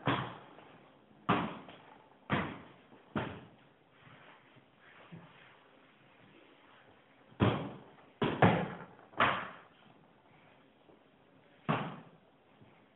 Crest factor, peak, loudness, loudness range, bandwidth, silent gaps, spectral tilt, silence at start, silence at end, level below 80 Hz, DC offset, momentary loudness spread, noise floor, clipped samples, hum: 28 dB; -12 dBFS; -35 LUFS; 19 LU; 4.2 kHz; none; -9 dB/octave; 0 s; 0.95 s; -64 dBFS; under 0.1%; 27 LU; -64 dBFS; under 0.1%; none